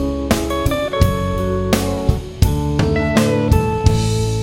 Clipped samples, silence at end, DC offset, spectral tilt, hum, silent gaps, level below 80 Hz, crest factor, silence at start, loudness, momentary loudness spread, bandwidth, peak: under 0.1%; 0 s; under 0.1%; -6 dB/octave; none; none; -24 dBFS; 16 dB; 0 s; -17 LUFS; 4 LU; 17 kHz; 0 dBFS